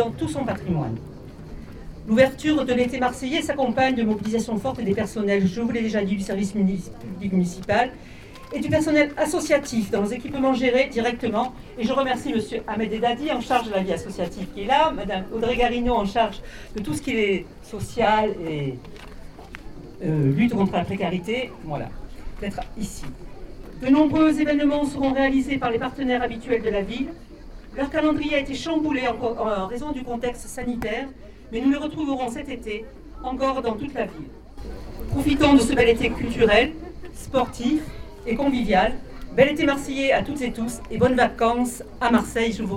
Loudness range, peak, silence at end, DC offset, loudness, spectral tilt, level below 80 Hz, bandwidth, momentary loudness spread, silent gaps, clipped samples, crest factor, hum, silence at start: 6 LU; -2 dBFS; 0 s; under 0.1%; -23 LUFS; -5.5 dB/octave; -40 dBFS; 16 kHz; 19 LU; none; under 0.1%; 20 dB; none; 0 s